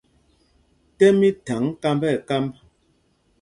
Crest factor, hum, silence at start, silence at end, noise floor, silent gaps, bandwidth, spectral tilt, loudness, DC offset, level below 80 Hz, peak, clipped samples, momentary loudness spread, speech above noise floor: 20 dB; none; 1 s; 0.9 s; -64 dBFS; none; 11 kHz; -6.5 dB/octave; -21 LUFS; under 0.1%; -58 dBFS; -4 dBFS; under 0.1%; 10 LU; 45 dB